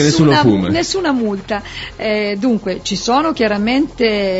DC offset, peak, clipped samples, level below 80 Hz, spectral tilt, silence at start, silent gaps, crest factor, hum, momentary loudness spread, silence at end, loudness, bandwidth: under 0.1%; -2 dBFS; under 0.1%; -40 dBFS; -5 dB/octave; 0 s; none; 14 dB; none; 11 LU; 0 s; -15 LUFS; 8 kHz